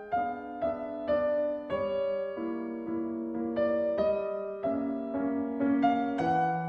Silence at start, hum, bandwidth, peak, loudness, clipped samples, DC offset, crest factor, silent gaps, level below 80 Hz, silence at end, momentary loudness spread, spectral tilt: 0 s; none; 6.6 kHz; -14 dBFS; -31 LUFS; under 0.1%; under 0.1%; 16 dB; none; -62 dBFS; 0 s; 7 LU; -8.5 dB/octave